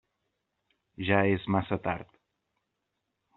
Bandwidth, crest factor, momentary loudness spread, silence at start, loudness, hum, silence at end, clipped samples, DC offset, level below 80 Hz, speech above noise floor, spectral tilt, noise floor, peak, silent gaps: 4.2 kHz; 24 dB; 11 LU; 1 s; -29 LUFS; none; 1.35 s; under 0.1%; under 0.1%; -62 dBFS; 54 dB; -5.5 dB/octave; -82 dBFS; -8 dBFS; none